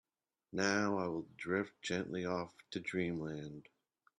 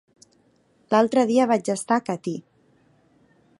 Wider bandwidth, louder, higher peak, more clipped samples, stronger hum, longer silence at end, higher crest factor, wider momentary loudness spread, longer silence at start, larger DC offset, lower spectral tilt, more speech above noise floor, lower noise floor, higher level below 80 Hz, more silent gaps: about the same, 10.5 kHz vs 11.5 kHz; second, -39 LUFS vs -22 LUFS; second, -20 dBFS vs -4 dBFS; neither; neither; second, 0.6 s vs 1.2 s; about the same, 20 dB vs 20 dB; about the same, 11 LU vs 12 LU; second, 0.55 s vs 0.9 s; neither; about the same, -5 dB/octave vs -5 dB/octave; second, 28 dB vs 41 dB; first, -67 dBFS vs -62 dBFS; about the same, -74 dBFS vs -74 dBFS; neither